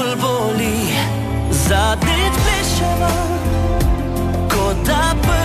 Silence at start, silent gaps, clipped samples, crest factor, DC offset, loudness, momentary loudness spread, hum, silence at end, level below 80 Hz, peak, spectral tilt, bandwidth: 0 s; none; under 0.1%; 12 dB; under 0.1%; -17 LUFS; 4 LU; none; 0 s; -22 dBFS; -4 dBFS; -4.5 dB/octave; 14 kHz